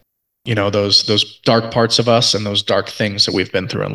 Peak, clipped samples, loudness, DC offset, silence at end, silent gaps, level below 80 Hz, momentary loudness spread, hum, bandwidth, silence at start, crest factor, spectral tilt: 0 dBFS; under 0.1%; -15 LUFS; under 0.1%; 0 s; none; -46 dBFS; 8 LU; none; 12.5 kHz; 0.45 s; 16 dB; -4 dB/octave